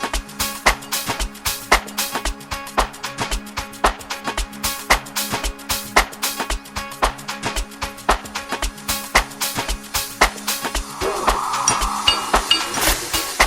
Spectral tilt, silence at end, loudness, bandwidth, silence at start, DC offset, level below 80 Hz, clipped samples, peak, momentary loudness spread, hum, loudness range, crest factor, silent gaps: -1.5 dB/octave; 0 s; -21 LUFS; over 20 kHz; 0 s; under 0.1%; -32 dBFS; under 0.1%; 0 dBFS; 8 LU; none; 4 LU; 22 dB; none